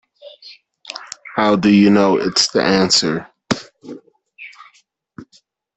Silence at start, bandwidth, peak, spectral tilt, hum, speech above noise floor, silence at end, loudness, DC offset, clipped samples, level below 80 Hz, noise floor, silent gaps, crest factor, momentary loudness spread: 0.25 s; 8.4 kHz; 0 dBFS; -4 dB/octave; none; 43 dB; 0.55 s; -15 LUFS; under 0.1%; under 0.1%; -56 dBFS; -57 dBFS; none; 18 dB; 25 LU